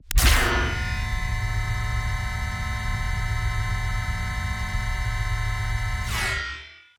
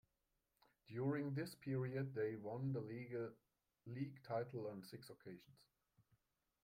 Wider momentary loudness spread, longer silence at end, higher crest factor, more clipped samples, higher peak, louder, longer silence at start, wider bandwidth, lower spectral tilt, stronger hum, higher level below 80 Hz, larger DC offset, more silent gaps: second, 7 LU vs 14 LU; second, 0.2 s vs 0.65 s; about the same, 20 dB vs 16 dB; neither; first, -6 dBFS vs -32 dBFS; first, -26 LUFS vs -47 LUFS; second, 0.05 s vs 0.9 s; first, over 20 kHz vs 16 kHz; second, -3.5 dB/octave vs -8 dB/octave; neither; first, -28 dBFS vs -82 dBFS; neither; neither